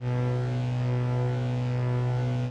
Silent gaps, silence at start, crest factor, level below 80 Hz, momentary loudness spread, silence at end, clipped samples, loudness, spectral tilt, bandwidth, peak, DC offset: none; 0 s; 8 dB; -50 dBFS; 1 LU; 0 s; under 0.1%; -28 LUFS; -8.5 dB/octave; 7.2 kHz; -20 dBFS; under 0.1%